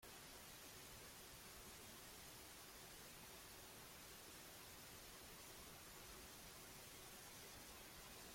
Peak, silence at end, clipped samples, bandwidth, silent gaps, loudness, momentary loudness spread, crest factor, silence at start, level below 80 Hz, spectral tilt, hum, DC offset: -46 dBFS; 0 s; under 0.1%; 16.5 kHz; none; -58 LUFS; 1 LU; 14 dB; 0 s; -72 dBFS; -2 dB/octave; none; under 0.1%